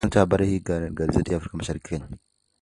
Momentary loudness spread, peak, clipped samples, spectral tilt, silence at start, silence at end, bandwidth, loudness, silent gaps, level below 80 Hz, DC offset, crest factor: 13 LU; -4 dBFS; under 0.1%; -7 dB/octave; 0 s; 0.45 s; 11.5 kHz; -25 LUFS; none; -38 dBFS; under 0.1%; 20 dB